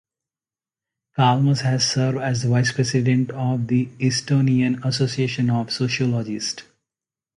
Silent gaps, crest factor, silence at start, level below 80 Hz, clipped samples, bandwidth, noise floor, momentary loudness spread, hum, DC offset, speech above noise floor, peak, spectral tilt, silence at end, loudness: none; 16 dB; 1.15 s; -58 dBFS; under 0.1%; 11 kHz; under -90 dBFS; 5 LU; none; under 0.1%; over 70 dB; -4 dBFS; -5.5 dB/octave; 0.75 s; -21 LUFS